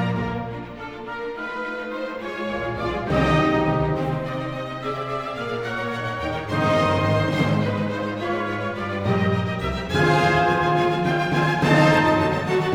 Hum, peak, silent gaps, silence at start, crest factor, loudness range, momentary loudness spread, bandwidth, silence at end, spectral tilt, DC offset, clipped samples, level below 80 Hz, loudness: none; -4 dBFS; none; 0 s; 18 dB; 6 LU; 11 LU; 13.5 kHz; 0 s; -6.5 dB/octave; under 0.1%; under 0.1%; -42 dBFS; -22 LUFS